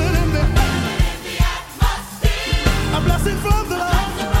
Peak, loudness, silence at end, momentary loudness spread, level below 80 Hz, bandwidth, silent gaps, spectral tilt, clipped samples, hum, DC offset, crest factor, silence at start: -4 dBFS; -19 LUFS; 0 s; 4 LU; -20 dBFS; 16.5 kHz; none; -5 dB/octave; under 0.1%; none; under 0.1%; 14 dB; 0 s